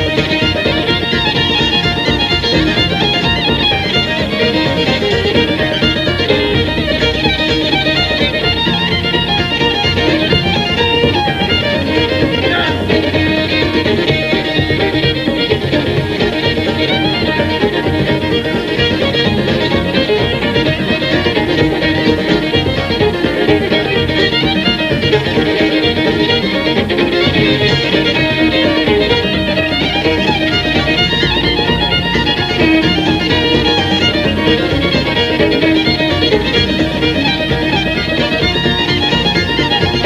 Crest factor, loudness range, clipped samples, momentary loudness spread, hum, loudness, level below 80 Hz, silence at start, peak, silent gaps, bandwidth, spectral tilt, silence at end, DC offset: 12 dB; 2 LU; under 0.1%; 2 LU; none; -12 LUFS; -30 dBFS; 0 s; 0 dBFS; none; 15 kHz; -5.5 dB/octave; 0 s; under 0.1%